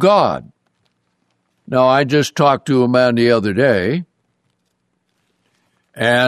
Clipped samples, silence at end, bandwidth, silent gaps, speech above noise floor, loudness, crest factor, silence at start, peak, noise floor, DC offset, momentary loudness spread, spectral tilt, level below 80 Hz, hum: under 0.1%; 0 s; 13.5 kHz; none; 54 dB; -15 LUFS; 16 dB; 0 s; -2 dBFS; -68 dBFS; under 0.1%; 8 LU; -6 dB/octave; -58 dBFS; none